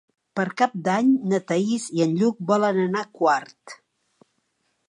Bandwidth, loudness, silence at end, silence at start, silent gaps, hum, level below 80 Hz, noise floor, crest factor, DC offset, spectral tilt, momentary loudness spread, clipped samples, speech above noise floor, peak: 11.5 kHz; -23 LUFS; 1.15 s; 0.35 s; none; none; -74 dBFS; -72 dBFS; 16 dB; under 0.1%; -6 dB/octave; 8 LU; under 0.1%; 50 dB; -8 dBFS